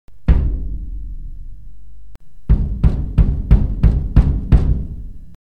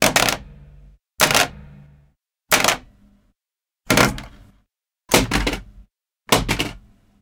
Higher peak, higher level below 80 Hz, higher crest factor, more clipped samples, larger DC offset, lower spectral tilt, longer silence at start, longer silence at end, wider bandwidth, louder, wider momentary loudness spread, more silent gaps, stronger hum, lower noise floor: about the same, 0 dBFS vs 0 dBFS; first, -18 dBFS vs -38 dBFS; second, 16 dB vs 22 dB; first, 0.2% vs under 0.1%; neither; first, -10 dB/octave vs -2.5 dB/octave; about the same, 0.1 s vs 0 s; second, 0.05 s vs 0.45 s; second, 3.8 kHz vs 19 kHz; about the same, -18 LUFS vs -18 LUFS; first, 19 LU vs 12 LU; neither; neither; second, -38 dBFS vs -89 dBFS